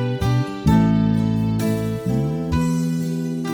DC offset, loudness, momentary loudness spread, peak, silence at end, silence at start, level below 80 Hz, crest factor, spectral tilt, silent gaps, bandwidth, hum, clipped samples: under 0.1%; -20 LUFS; 6 LU; -4 dBFS; 0 s; 0 s; -36 dBFS; 14 dB; -7.5 dB/octave; none; 19 kHz; none; under 0.1%